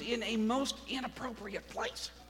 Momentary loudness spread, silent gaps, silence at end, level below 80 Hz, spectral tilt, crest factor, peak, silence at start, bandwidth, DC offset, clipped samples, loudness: 10 LU; none; 0 s; -58 dBFS; -3.5 dB/octave; 16 dB; -20 dBFS; 0 s; 16.5 kHz; under 0.1%; under 0.1%; -36 LUFS